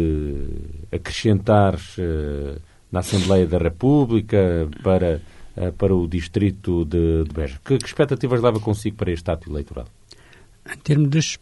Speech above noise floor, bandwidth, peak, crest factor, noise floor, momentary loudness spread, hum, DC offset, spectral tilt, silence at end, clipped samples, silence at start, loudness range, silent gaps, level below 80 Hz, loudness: 28 dB; 11.5 kHz; -4 dBFS; 16 dB; -48 dBFS; 13 LU; none; under 0.1%; -7 dB/octave; 0.05 s; under 0.1%; 0 s; 3 LU; none; -34 dBFS; -21 LUFS